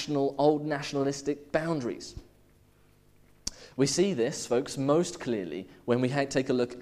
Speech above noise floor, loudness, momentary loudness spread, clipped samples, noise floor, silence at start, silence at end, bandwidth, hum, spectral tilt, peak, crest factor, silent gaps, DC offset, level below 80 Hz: 33 dB; -29 LUFS; 13 LU; under 0.1%; -61 dBFS; 0 s; 0 s; 14.5 kHz; 50 Hz at -60 dBFS; -5 dB/octave; -10 dBFS; 20 dB; none; under 0.1%; -58 dBFS